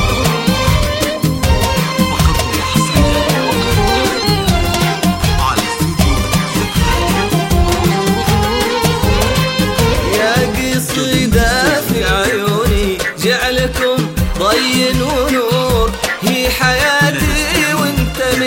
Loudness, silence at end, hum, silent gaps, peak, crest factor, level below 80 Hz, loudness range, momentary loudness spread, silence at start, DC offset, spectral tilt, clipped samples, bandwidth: -13 LUFS; 0 s; none; none; 0 dBFS; 14 dB; -22 dBFS; 1 LU; 3 LU; 0 s; under 0.1%; -4.5 dB/octave; under 0.1%; 16.5 kHz